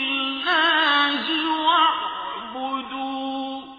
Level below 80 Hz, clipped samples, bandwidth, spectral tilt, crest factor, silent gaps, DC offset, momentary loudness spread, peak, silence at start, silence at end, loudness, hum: -64 dBFS; under 0.1%; 5 kHz; -3 dB/octave; 16 dB; none; under 0.1%; 12 LU; -6 dBFS; 0 s; 0 s; -21 LUFS; none